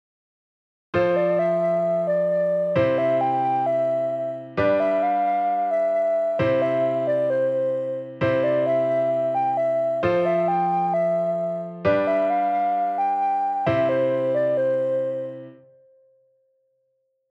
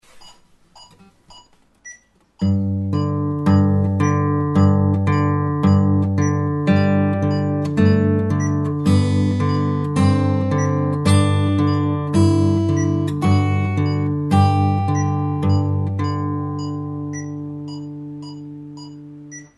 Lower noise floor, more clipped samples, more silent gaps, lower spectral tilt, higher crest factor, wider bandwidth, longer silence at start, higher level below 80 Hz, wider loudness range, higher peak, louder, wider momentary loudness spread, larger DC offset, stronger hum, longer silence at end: first, -71 dBFS vs -50 dBFS; neither; neither; about the same, -8.5 dB/octave vs -7.5 dB/octave; about the same, 14 dB vs 16 dB; second, 7.6 kHz vs 11 kHz; first, 0.95 s vs 0.15 s; second, -60 dBFS vs -52 dBFS; second, 2 LU vs 7 LU; second, -8 dBFS vs -2 dBFS; second, -22 LUFS vs -18 LUFS; second, 4 LU vs 14 LU; neither; neither; first, 1.8 s vs 0.15 s